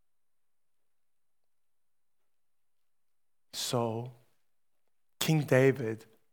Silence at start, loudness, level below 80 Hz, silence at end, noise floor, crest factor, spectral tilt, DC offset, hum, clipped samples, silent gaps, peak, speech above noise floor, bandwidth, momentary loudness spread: 3.55 s; -30 LUFS; -80 dBFS; 0.35 s; under -90 dBFS; 24 dB; -5 dB/octave; under 0.1%; none; under 0.1%; none; -10 dBFS; over 62 dB; over 20 kHz; 18 LU